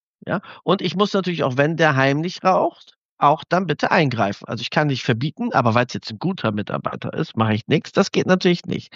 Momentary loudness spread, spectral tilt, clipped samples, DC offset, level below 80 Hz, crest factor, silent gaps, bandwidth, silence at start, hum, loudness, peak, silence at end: 9 LU; -6 dB/octave; under 0.1%; under 0.1%; -62 dBFS; 18 dB; 2.96-3.17 s; 7.6 kHz; 0.25 s; none; -20 LUFS; -2 dBFS; 0.1 s